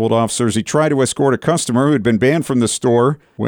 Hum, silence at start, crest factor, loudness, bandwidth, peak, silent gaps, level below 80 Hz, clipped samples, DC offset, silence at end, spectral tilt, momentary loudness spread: none; 0 s; 12 dB; -15 LUFS; 19 kHz; -4 dBFS; none; -52 dBFS; under 0.1%; under 0.1%; 0 s; -5.5 dB/octave; 3 LU